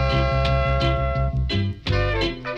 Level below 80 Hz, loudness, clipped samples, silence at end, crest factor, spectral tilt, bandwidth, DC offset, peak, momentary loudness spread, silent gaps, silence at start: -26 dBFS; -22 LUFS; under 0.1%; 0 s; 14 dB; -7 dB/octave; 7.6 kHz; under 0.1%; -8 dBFS; 4 LU; none; 0 s